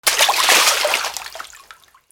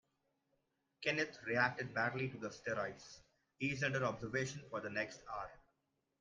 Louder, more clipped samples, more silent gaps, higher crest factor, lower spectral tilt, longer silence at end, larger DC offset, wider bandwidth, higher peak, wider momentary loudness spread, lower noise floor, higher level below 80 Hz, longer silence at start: first, -14 LUFS vs -40 LUFS; neither; neither; about the same, 18 dB vs 22 dB; second, 2.5 dB/octave vs -5 dB/octave; about the same, 0.55 s vs 0.65 s; neither; first, 20 kHz vs 9.8 kHz; first, 0 dBFS vs -20 dBFS; first, 22 LU vs 11 LU; second, -47 dBFS vs -84 dBFS; first, -58 dBFS vs -72 dBFS; second, 0.05 s vs 1 s